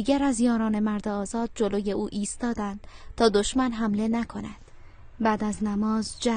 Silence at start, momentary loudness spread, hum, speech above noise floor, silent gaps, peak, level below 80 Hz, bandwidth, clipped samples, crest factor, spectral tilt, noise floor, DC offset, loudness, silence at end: 0 s; 10 LU; none; 20 dB; none; -6 dBFS; -46 dBFS; 10 kHz; under 0.1%; 20 dB; -5 dB/octave; -46 dBFS; under 0.1%; -26 LUFS; 0 s